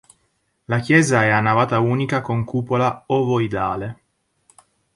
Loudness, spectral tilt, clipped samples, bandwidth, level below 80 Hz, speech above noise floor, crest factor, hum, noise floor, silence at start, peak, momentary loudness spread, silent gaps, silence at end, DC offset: -19 LUFS; -6 dB/octave; under 0.1%; 11.5 kHz; -52 dBFS; 49 dB; 18 dB; none; -68 dBFS; 0.7 s; -2 dBFS; 9 LU; none; 1 s; under 0.1%